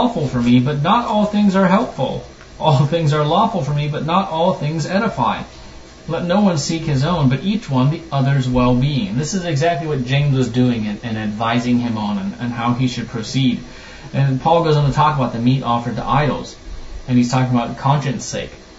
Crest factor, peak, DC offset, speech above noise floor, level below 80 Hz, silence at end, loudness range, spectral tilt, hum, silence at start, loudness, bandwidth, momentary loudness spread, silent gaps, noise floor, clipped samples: 18 dB; 0 dBFS; under 0.1%; 20 dB; -38 dBFS; 0 s; 3 LU; -6.5 dB/octave; none; 0 s; -18 LUFS; 8 kHz; 9 LU; none; -37 dBFS; under 0.1%